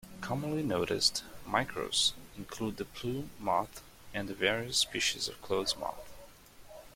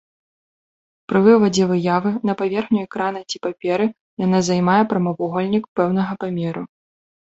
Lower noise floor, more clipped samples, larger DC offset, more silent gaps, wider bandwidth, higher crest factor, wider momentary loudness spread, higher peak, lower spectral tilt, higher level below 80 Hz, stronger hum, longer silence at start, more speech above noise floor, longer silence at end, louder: second, -54 dBFS vs under -90 dBFS; neither; neither; second, none vs 4.00-4.17 s, 5.68-5.76 s; first, 16.5 kHz vs 8 kHz; about the same, 22 dB vs 18 dB; first, 15 LU vs 10 LU; second, -12 dBFS vs -2 dBFS; second, -2.5 dB/octave vs -6.5 dB/octave; about the same, -58 dBFS vs -60 dBFS; neither; second, 0.05 s vs 1.1 s; second, 20 dB vs over 72 dB; second, 0 s vs 0.7 s; second, -32 LUFS vs -19 LUFS